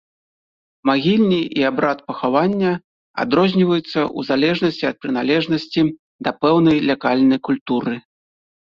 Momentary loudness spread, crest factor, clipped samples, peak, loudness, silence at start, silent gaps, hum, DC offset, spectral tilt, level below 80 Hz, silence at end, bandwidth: 8 LU; 16 dB; under 0.1%; -2 dBFS; -18 LUFS; 0.85 s; 2.84-3.14 s, 5.99-6.19 s, 7.61-7.66 s; none; under 0.1%; -7.5 dB/octave; -56 dBFS; 0.6 s; 7 kHz